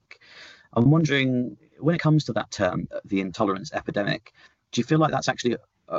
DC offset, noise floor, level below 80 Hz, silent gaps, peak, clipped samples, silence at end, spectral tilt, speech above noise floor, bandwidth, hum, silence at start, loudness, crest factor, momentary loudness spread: under 0.1%; -49 dBFS; -58 dBFS; none; -10 dBFS; under 0.1%; 0 s; -6 dB/octave; 25 dB; 7.8 kHz; none; 0.35 s; -25 LUFS; 16 dB; 11 LU